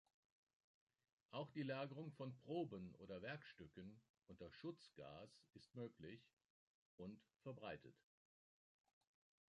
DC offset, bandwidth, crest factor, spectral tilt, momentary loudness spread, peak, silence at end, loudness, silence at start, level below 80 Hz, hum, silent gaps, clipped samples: under 0.1%; 9.4 kHz; 20 dB; -7.5 dB/octave; 13 LU; -36 dBFS; 1.6 s; -55 LUFS; 1.3 s; -82 dBFS; none; 4.10-4.14 s, 6.33-6.37 s, 6.45-6.98 s; under 0.1%